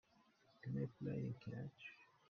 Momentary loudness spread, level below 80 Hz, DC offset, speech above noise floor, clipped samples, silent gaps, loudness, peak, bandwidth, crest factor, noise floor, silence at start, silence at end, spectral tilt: 11 LU; -78 dBFS; under 0.1%; 27 dB; under 0.1%; none; -49 LUFS; -32 dBFS; 6.4 kHz; 18 dB; -74 dBFS; 0.65 s; 0.25 s; -8 dB/octave